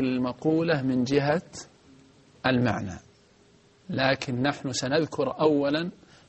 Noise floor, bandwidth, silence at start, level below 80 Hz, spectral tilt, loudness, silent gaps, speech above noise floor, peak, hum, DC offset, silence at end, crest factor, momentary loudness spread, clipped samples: -59 dBFS; 8.4 kHz; 0 s; -60 dBFS; -5.5 dB/octave; -26 LUFS; none; 33 dB; -8 dBFS; none; under 0.1%; 0.35 s; 20 dB; 11 LU; under 0.1%